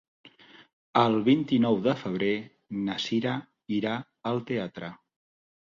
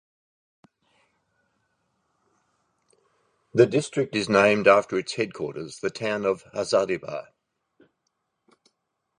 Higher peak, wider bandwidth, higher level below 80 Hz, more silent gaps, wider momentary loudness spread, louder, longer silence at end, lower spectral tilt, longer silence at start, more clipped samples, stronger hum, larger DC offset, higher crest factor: about the same, -6 dBFS vs -4 dBFS; second, 7.6 kHz vs 11 kHz; about the same, -66 dBFS vs -66 dBFS; first, 0.73-0.93 s vs none; about the same, 12 LU vs 13 LU; second, -28 LUFS vs -23 LUFS; second, 0.85 s vs 2 s; first, -6.5 dB/octave vs -5 dB/octave; second, 0.25 s vs 3.55 s; neither; neither; neither; about the same, 22 dB vs 24 dB